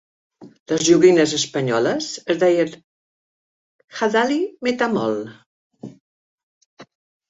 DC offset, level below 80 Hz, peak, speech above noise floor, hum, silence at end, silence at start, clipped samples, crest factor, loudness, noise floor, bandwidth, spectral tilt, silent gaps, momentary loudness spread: under 0.1%; -64 dBFS; -2 dBFS; over 72 dB; none; 0.45 s; 0.4 s; under 0.1%; 18 dB; -19 LUFS; under -90 dBFS; 8 kHz; -4 dB/octave; 0.60-0.66 s, 2.84-3.88 s, 5.46-5.70 s, 6.00-6.77 s; 23 LU